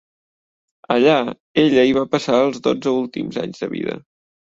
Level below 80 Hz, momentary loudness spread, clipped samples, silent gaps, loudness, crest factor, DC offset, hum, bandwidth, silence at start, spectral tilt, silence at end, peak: -58 dBFS; 11 LU; under 0.1%; 1.40-1.55 s; -18 LUFS; 18 dB; under 0.1%; none; 7.8 kHz; 0.9 s; -6 dB/octave; 0.6 s; -2 dBFS